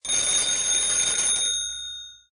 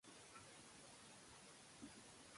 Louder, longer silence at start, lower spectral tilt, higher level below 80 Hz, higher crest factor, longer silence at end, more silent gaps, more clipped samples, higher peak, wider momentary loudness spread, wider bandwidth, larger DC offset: first, -21 LUFS vs -61 LUFS; about the same, 0.05 s vs 0.05 s; second, 2 dB/octave vs -2.5 dB/octave; first, -54 dBFS vs -82 dBFS; about the same, 14 dB vs 18 dB; first, 0.2 s vs 0 s; neither; neither; first, -10 dBFS vs -44 dBFS; first, 13 LU vs 2 LU; about the same, 11.5 kHz vs 11.5 kHz; neither